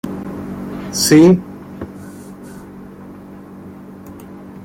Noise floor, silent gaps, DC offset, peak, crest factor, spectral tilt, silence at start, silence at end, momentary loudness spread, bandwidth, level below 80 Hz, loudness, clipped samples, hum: -35 dBFS; none; under 0.1%; -2 dBFS; 16 dB; -5 dB/octave; 0.05 s; 0 s; 26 LU; 16.5 kHz; -48 dBFS; -14 LUFS; under 0.1%; none